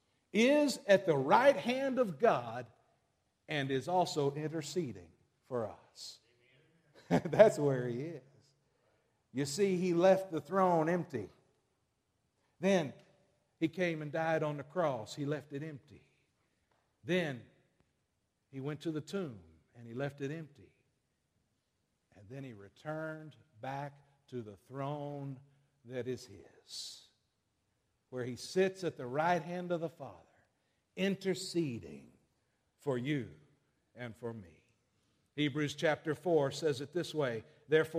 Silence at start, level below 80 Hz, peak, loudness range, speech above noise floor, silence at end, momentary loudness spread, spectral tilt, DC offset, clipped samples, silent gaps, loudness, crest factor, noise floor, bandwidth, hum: 0.35 s; -76 dBFS; -10 dBFS; 13 LU; 47 dB; 0 s; 20 LU; -5.5 dB/octave; under 0.1%; under 0.1%; none; -34 LUFS; 26 dB; -81 dBFS; 15.5 kHz; none